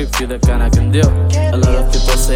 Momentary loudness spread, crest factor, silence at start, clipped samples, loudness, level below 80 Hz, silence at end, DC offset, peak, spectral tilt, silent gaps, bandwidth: 3 LU; 12 dB; 0 s; under 0.1%; -14 LUFS; -14 dBFS; 0 s; under 0.1%; 0 dBFS; -5.5 dB/octave; none; 16.5 kHz